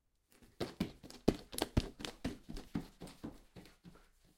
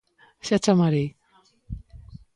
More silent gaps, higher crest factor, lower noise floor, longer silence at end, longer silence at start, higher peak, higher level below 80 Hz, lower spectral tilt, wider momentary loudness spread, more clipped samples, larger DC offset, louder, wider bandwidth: neither; first, 32 dB vs 18 dB; first, -67 dBFS vs -61 dBFS; first, 0.4 s vs 0.2 s; about the same, 0.4 s vs 0.45 s; second, -12 dBFS vs -8 dBFS; about the same, -52 dBFS vs -48 dBFS; about the same, -5.5 dB/octave vs -6 dB/octave; about the same, 21 LU vs 21 LU; neither; neither; second, -42 LUFS vs -23 LUFS; first, 16.5 kHz vs 11.5 kHz